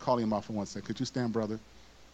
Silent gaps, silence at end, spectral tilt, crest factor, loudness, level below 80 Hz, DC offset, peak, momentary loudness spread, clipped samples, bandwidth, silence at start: none; 0.05 s; -6 dB/octave; 18 dB; -34 LUFS; -62 dBFS; under 0.1%; -14 dBFS; 8 LU; under 0.1%; 8.6 kHz; 0 s